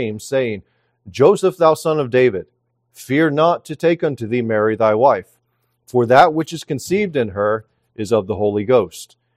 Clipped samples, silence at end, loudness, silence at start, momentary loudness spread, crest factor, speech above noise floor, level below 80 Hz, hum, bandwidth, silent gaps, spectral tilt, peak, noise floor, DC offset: under 0.1%; 0.3 s; -17 LUFS; 0 s; 11 LU; 18 dB; 51 dB; -60 dBFS; none; 15.5 kHz; none; -6 dB/octave; 0 dBFS; -67 dBFS; under 0.1%